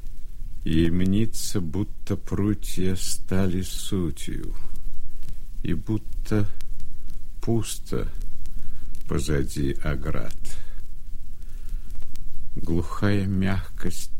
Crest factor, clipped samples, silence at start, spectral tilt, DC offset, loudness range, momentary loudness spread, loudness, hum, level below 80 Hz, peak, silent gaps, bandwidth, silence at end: 10 dB; under 0.1%; 0 s; -6 dB/octave; under 0.1%; 6 LU; 19 LU; -28 LUFS; none; -30 dBFS; -8 dBFS; none; 15 kHz; 0 s